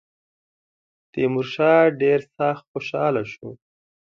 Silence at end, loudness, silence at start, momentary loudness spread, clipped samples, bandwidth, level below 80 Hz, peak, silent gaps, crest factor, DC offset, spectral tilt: 0.55 s; -21 LUFS; 1.15 s; 18 LU; under 0.1%; 7 kHz; -66 dBFS; -4 dBFS; 2.68-2.74 s; 18 dB; under 0.1%; -7.5 dB/octave